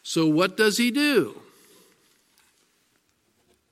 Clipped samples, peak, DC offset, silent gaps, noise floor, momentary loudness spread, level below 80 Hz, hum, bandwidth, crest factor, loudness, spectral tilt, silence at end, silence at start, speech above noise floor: under 0.1%; -6 dBFS; under 0.1%; none; -68 dBFS; 4 LU; -78 dBFS; none; 15.5 kHz; 20 dB; -22 LUFS; -4 dB/octave; 2.35 s; 0.05 s; 46 dB